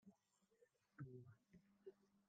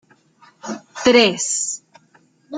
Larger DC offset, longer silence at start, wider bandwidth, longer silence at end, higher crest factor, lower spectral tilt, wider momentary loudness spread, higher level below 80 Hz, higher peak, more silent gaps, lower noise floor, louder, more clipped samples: neither; second, 0.05 s vs 0.65 s; about the same, 8.8 kHz vs 9.6 kHz; about the same, 0.05 s vs 0 s; about the same, 20 dB vs 20 dB; first, -8 dB/octave vs -2 dB/octave; second, 7 LU vs 19 LU; second, under -90 dBFS vs -60 dBFS; second, -46 dBFS vs -2 dBFS; neither; first, -83 dBFS vs -56 dBFS; second, -63 LUFS vs -16 LUFS; neither